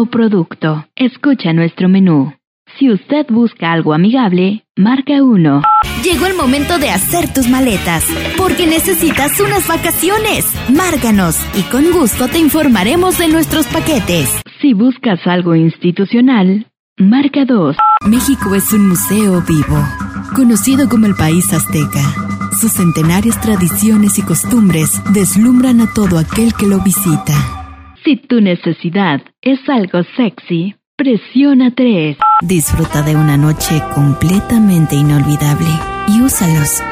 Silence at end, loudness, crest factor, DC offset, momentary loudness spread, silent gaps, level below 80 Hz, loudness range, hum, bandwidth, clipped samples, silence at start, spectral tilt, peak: 0 s; -11 LUFS; 10 dB; under 0.1%; 6 LU; 2.47-2.65 s, 4.70-4.75 s, 16.79-16.96 s, 30.87-30.98 s; -32 dBFS; 2 LU; none; 16 kHz; under 0.1%; 0 s; -5 dB/octave; -2 dBFS